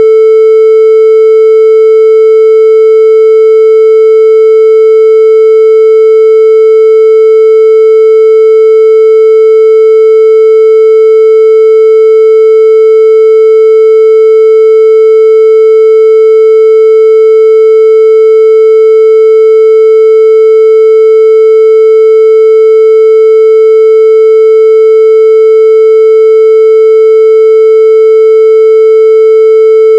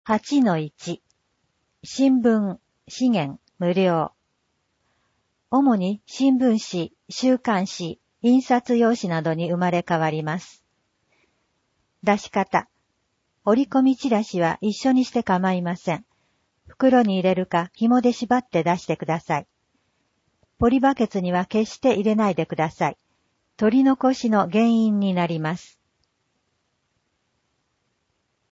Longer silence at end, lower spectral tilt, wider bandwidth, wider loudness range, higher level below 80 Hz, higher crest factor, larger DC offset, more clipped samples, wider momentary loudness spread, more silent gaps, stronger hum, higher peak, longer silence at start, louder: second, 0 s vs 2.95 s; second, -2.5 dB/octave vs -6.5 dB/octave; second, 5.2 kHz vs 7.8 kHz; second, 0 LU vs 5 LU; second, under -90 dBFS vs -56 dBFS; second, 2 dB vs 16 dB; neither; first, 40% vs under 0.1%; second, 0 LU vs 10 LU; neither; neither; first, 0 dBFS vs -6 dBFS; about the same, 0 s vs 0.05 s; first, -3 LUFS vs -22 LUFS